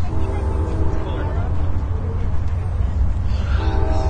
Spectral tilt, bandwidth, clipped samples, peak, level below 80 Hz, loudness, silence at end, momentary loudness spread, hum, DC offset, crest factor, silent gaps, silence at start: -8 dB/octave; 8.4 kHz; under 0.1%; -6 dBFS; -22 dBFS; -23 LUFS; 0 s; 3 LU; none; under 0.1%; 12 dB; none; 0 s